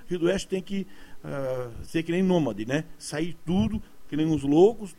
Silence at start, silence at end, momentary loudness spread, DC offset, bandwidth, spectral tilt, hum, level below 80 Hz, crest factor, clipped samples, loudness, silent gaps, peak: 0 s; 0.05 s; 13 LU; under 0.1%; 15.5 kHz; -6.5 dB/octave; none; -48 dBFS; 18 dB; under 0.1%; -27 LUFS; none; -8 dBFS